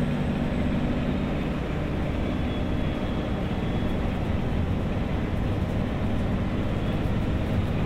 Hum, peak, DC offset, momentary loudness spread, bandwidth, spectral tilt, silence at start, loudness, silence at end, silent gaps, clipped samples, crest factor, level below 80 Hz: none; -14 dBFS; under 0.1%; 2 LU; 14.5 kHz; -8 dB/octave; 0 s; -28 LUFS; 0 s; none; under 0.1%; 12 dB; -32 dBFS